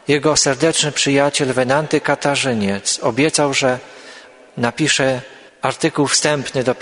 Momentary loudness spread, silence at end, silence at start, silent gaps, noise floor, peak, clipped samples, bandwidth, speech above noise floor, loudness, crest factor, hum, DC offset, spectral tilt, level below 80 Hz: 8 LU; 0 s; 0.1 s; none; -41 dBFS; 0 dBFS; under 0.1%; 11 kHz; 24 dB; -16 LUFS; 18 dB; none; under 0.1%; -3 dB/octave; -52 dBFS